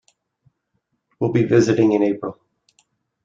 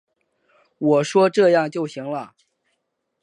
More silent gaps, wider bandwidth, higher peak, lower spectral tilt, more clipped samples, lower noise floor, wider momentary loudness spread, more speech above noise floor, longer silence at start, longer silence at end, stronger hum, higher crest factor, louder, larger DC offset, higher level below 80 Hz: neither; second, 7.6 kHz vs 10.5 kHz; about the same, -4 dBFS vs -4 dBFS; about the same, -7 dB/octave vs -6 dB/octave; neither; about the same, -72 dBFS vs -75 dBFS; about the same, 12 LU vs 14 LU; about the same, 55 dB vs 56 dB; first, 1.2 s vs 0.8 s; about the same, 0.95 s vs 0.95 s; neither; about the same, 18 dB vs 18 dB; about the same, -18 LUFS vs -19 LUFS; neither; first, -58 dBFS vs -76 dBFS